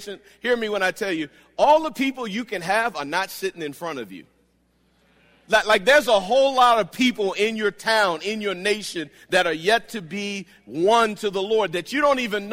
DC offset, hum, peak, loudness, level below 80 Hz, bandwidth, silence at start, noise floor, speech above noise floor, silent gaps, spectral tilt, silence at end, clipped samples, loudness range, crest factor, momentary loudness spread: under 0.1%; none; -6 dBFS; -21 LUFS; -58 dBFS; 16 kHz; 0 s; -64 dBFS; 42 dB; none; -3.5 dB/octave; 0 s; under 0.1%; 7 LU; 16 dB; 14 LU